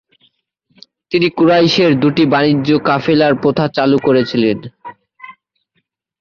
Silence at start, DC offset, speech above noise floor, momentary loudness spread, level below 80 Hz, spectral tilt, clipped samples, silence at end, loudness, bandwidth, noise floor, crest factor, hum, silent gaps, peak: 1.1 s; under 0.1%; 55 dB; 5 LU; -54 dBFS; -7 dB/octave; under 0.1%; 0.9 s; -13 LUFS; 7 kHz; -67 dBFS; 14 dB; none; none; 0 dBFS